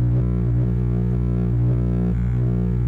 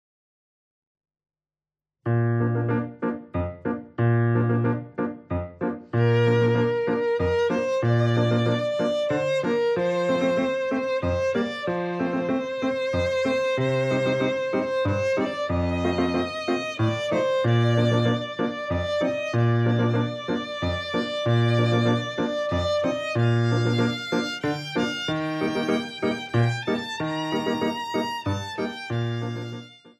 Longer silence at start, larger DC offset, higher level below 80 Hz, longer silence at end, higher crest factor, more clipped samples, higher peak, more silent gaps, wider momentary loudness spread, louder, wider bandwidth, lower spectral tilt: second, 0 s vs 2.05 s; neither; first, -26 dBFS vs -50 dBFS; about the same, 0 s vs 0.1 s; second, 6 dB vs 14 dB; neither; second, -14 dBFS vs -10 dBFS; neither; second, 1 LU vs 7 LU; first, -21 LUFS vs -24 LUFS; second, 2.7 kHz vs 9 kHz; first, -11.5 dB/octave vs -7 dB/octave